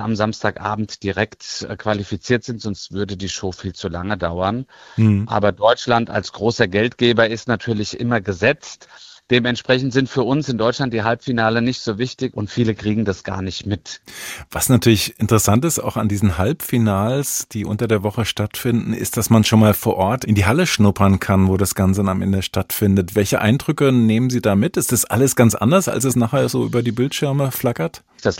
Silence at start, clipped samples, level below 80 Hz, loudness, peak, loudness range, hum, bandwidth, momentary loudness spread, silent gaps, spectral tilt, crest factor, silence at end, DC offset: 0 s; under 0.1%; -48 dBFS; -18 LUFS; -2 dBFS; 6 LU; none; 16.5 kHz; 10 LU; none; -5 dB/octave; 16 dB; 0 s; under 0.1%